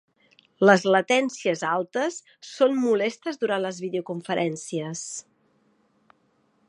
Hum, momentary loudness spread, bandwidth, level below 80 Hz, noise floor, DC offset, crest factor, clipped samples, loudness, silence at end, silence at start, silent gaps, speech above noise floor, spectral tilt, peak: none; 13 LU; 11 kHz; -78 dBFS; -67 dBFS; under 0.1%; 24 dB; under 0.1%; -24 LUFS; 1.5 s; 0.6 s; none; 43 dB; -4.5 dB/octave; -2 dBFS